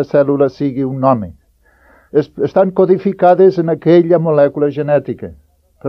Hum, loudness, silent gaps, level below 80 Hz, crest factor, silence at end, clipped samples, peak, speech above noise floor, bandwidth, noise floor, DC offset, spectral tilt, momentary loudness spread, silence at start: none; -13 LUFS; none; -50 dBFS; 14 dB; 0 s; under 0.1%; 0 dBFS; 40 dB; 6 kHz; -52 dBFS; under 0.1%; -10 dB/octave; 8 LU; 0 s